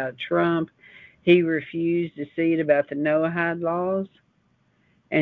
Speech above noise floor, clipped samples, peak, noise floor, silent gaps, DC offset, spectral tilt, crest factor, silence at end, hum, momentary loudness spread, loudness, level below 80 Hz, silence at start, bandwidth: 43 dB; under 0.1%; -6 dBFS; -65 dBFS; none; under 0.1%; -9.5 dB/octave; 18 dB; 0 s; none; 9 LU; -23 LUFS; -64 dBFS; 0 s; 4.3 kHz